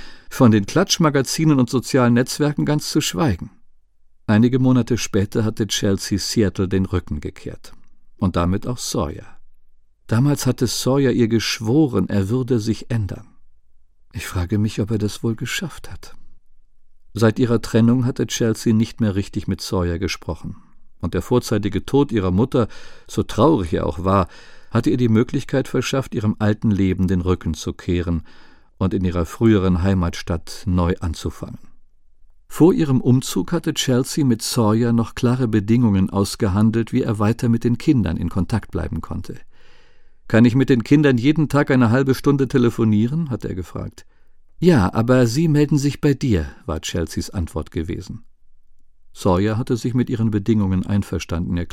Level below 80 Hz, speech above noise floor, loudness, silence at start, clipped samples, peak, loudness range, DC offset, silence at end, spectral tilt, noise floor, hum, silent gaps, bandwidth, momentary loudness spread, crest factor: -38 dBFS; 32 dB; -19 LUFS; 0 s; under 0.1%; 0 dBFS; 6 LU; under 0.1%; 0 s; -6 dB/octave; -50 dBFS; none; none; 16 kHz; 12 LU; 18 dB